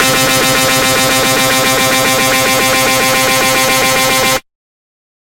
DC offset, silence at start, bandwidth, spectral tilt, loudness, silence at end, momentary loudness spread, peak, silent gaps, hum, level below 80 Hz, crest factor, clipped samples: under 0.1%; 0 s; 16.5 kHz; -2 dB/octave; -9 LUFS; 0.8 s; 0 LU; 0 dBFS; none; none; -38 dBFS; 12 dB; under 0.1%